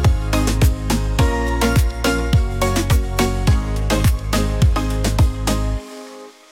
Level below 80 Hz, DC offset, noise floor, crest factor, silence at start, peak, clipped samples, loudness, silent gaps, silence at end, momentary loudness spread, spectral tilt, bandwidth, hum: -20 dBFS; under 0.1%; -38 dBFS; 12 dB; 0 s; -4 dBFS; under 0.1%; -19 LUFS; none; 0.2 s; 5 LU; -5.5 dB/octave; 17 kHz; none